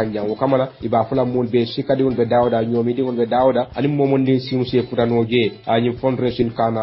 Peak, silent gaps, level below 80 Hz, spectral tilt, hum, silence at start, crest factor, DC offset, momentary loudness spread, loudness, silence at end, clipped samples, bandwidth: -2 dBFS; none; -48 dBFS; -12 dB/octave; none; 0 s; 16 dB; under 0.1%; 4 LU; -19 LUFS; 0 s; under 0.1%; 5.8 kHz